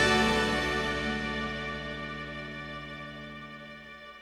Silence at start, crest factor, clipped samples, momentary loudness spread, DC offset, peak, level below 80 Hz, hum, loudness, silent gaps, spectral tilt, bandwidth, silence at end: 0 s; 20 dB; under 0.1%; 18 LU; under 0.1%; -12 dBFS; -46 dBFS; 60 Hz at -70 dBFS; -31 LUFS; none; -4 dB/octave; 16 kHz; 0 s